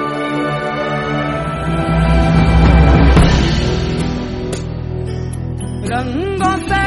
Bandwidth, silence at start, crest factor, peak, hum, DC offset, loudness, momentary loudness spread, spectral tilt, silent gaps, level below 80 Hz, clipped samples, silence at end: 11.5 kHz; 0 s; 14 dB; 0 dBFS; none; under 0.1%; -15 LUFS; 13 LU; -6.5 dB/octave; none; -18 dBFS; under 0.1%; 0 s